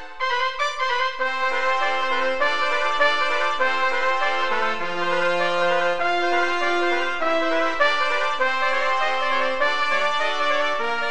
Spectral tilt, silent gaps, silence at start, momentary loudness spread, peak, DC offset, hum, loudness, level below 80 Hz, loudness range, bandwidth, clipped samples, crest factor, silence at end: -2.5 dB/octave; none; 0 s; 3 LU; -6 dBFS; 4%; none; -21 LUFS; -56 dBFS; 1 LU; 10.5 kHz; under 0.1%; 18 dB; 0 s